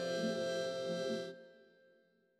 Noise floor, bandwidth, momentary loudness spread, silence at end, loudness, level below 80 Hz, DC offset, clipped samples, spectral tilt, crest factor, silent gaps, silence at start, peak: -72 dBFS; 13.5 kHz; 10 LU; 0.75 s; -39 LUFS; under -90 dBFS; under 0.1%; under 0.1%; -4.5 dB/octave; 14 dB; none; 0 s; -26 dBFS